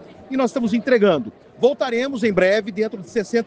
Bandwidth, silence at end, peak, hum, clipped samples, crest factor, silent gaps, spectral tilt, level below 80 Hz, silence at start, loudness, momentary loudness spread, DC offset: 9.2 kHz; 0 s; -4 dBFS; none; under 0.1%; 16 dB; none; -5.5 dB/octave; -58 dBFS; 0 s; -20 LUFS; 9 LU; under 0.1%